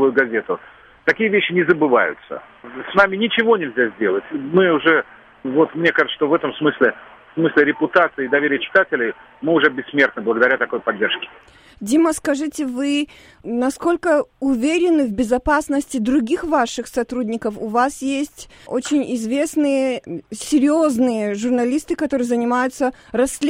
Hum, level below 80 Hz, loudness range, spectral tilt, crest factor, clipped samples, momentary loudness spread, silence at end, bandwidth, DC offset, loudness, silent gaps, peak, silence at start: none; -48 dBFS; 4 LU; -4.5 dB/octave; 18 dB; under 0.1%; 10 LU; 0 s; 16 kHz; under 0.1%; -18 LUFS; none; 0 dBFS; 0 s